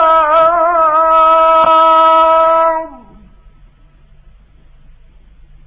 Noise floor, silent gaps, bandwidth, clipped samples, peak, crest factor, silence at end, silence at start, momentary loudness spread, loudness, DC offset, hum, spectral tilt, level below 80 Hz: -44 dBFS; none; 4 kHz; under 0.1%; -2 dBFS; 10 dB; 2.7 s; 0 s; 5 LU; -9 LUFS; under 0.1%; none; -6.5 dB/octave; -44 dBFS